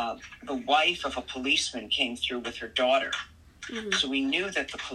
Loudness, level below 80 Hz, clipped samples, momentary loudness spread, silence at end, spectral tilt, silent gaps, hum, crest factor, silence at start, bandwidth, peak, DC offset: -27 LUFS; -58 dBFS; under 0.1%; 13 LU; 0 s; -2 dB/octave; none; none; 18 dB; 0 s; 12.5 kHz; -10 dBFS; under 0.1%